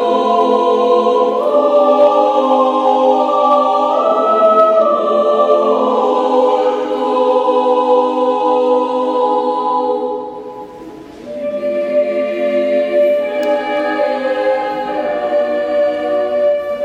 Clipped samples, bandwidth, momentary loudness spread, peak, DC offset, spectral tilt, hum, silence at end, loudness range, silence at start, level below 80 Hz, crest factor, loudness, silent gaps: under 0.1%; 9 kHz; 8 LU; 0 dBFS; under 0.1%; -5 dB/octave; none; 0 s; 6 LU; 0 s; -58 dBFS; 12 dB; -13 LUFS; none